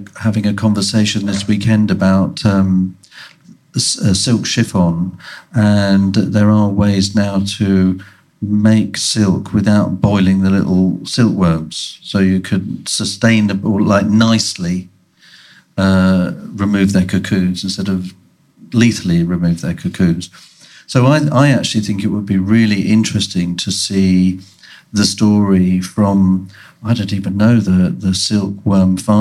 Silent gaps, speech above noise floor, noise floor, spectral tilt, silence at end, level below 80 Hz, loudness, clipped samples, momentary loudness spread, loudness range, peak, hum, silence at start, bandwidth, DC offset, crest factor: none; 32 dB; -46 dBFS; -5.5 dB/octave; 0 s; -44 dBFS; -14 LUFS; under 0.1%; 8 LU; 2 LU; 0 dBFS; none; 0 s; 13 kHz; under 0.1%; 14 dB